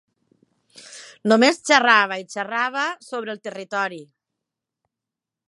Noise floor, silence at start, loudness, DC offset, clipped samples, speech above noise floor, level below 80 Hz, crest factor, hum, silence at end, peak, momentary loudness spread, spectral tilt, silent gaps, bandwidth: -87 dBFS; 0.9 s; -20 LUFS; under 0.1%; under 0.1%; 66 dB; -78 dBFS; 22 dB; none; 1.45 s; 0 dBFS; 22 LU; -3 dB/octave; none; 11.5 kHz